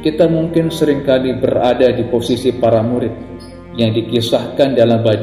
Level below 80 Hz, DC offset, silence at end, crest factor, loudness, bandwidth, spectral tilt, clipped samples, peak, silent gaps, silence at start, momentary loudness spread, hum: -42 dBFS; 0.1%; 0 s; 14 dB; -14 LUFS; 15 kHz; -7 dB/octave; under 0.1%; 0 dBFS; none; 0 s; 8 LU; none